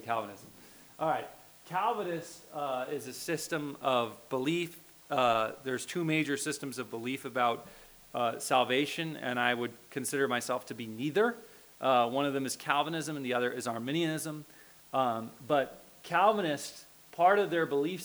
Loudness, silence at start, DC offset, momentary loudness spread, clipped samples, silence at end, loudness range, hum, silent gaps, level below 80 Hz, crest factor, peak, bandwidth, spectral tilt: -32 LUFS; 0 s; under 0.1%; 13 LU; under 0.1%; 0 s; 3 LU; none; none; -74 dBFS; 22 dB; -10 dBFS; over 20 kHz; -4 dB/octave